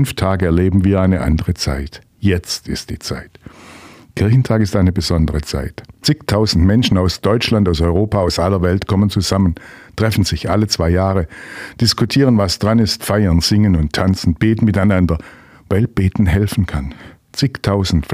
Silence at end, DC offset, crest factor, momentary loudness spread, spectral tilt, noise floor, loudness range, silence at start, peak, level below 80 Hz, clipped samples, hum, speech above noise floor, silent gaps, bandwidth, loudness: 0 s; under 0.1%; 14 dB; 11 LU; -6 dB/octave; -40 dBFS; 4 LU; 0 s; 0 dBFS; -30 dBFS; under 0.1%; none; 25 dB; none; 16 kHz; -16 LUFS